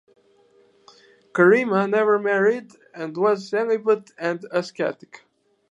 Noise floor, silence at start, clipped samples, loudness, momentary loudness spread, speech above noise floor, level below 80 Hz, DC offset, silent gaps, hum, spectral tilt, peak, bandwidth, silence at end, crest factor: -58 dBFS; 1.35 s; under 0.1%; -21 LUFS; 13 LU; 37 dB; -78 dBFS; under 0.1%; none; none; -6.5 dB/octave; -4 dBFS; 8.2 kHz; 0.8 s; 20 dB